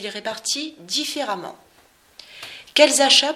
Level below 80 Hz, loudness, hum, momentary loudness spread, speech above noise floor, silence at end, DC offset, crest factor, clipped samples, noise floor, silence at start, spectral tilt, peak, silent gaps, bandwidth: -68 dBFS; -19 LUFS; none; 23 LU; 35 dB; 0 s; under 0.1%; 22 dB; under 0.1%; -55 dBFS; 0 s; 0 dB/octave; 0 dBFS; none; 16 kHz